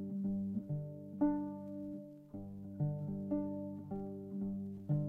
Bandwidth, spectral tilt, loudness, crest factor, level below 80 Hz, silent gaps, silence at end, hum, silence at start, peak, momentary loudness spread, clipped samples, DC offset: 2.2 kHz; -12 dB/octave; -41 LUFS; 16 dB; -64 dBFS; none; 0 s; 50 Hz at -60 dBFS; 0 s; -24 dBFS; 12 LU; under 0.1%; under 0.1%